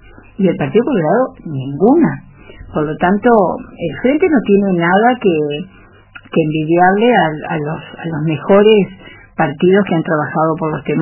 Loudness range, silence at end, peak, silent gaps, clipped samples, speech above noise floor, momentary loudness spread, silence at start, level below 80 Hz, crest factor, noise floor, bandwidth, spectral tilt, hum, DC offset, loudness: 2 LU; 0 s; 0 dBFS; none; under 0.1%; 26 dB; 12 LU; 0.4 s; -44 dBFS; 14 dB; -39 dBFS; 3.1 kHz; -11 dB/octave; none; under 0.1%; -14 LUFS